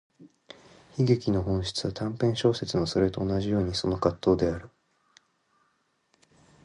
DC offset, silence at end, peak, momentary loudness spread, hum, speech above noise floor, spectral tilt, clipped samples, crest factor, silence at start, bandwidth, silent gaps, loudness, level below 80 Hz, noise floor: under 0.1%; 1.95 s; -8 dBFS; 6 LU; none; 46 dB; -6.5 dB/octave; under 0.1%; 20 dB; 0.2 s; 11 kHz; none; -27 LUFS; -48 dBFS; -72 dBFS